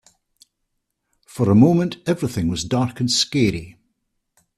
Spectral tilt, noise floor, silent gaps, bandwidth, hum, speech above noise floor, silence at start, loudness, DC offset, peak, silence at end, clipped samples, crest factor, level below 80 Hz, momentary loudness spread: -5.5 dB/octave; -75 dBFS; none; 14 kHz; none; 57 dB; 1.35 s; -19 LUFS; under 0.1%; -2 dBFS; 0.85 s; under 0.1%; 18 dB; -50 dBFS; 9 LU